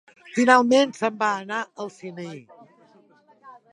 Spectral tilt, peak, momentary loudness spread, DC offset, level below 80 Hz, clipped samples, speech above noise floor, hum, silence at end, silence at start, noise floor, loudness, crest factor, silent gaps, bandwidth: -4 dB/octave; -2 dBFS; 21 LU; under 0.1%; -80 dBFS; under 0.1%; 35 dB; none; 0.2 s; 0.35 s; -57 dBFS; -21 LUFS; 22 dB; none; 11 kHz